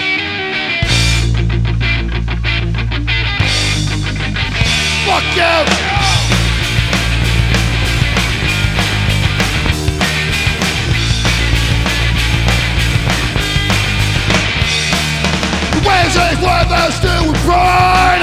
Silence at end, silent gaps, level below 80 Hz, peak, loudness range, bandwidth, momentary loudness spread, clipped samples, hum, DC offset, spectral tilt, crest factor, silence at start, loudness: 0 s; none; -20 dBFS; 0 dBFS; 2 LU; 15.5 kHz; 5 LU; under 0.1%; none; under 0.1%; -4 dB/octave; 12 dB; 0 s; -13 LUFS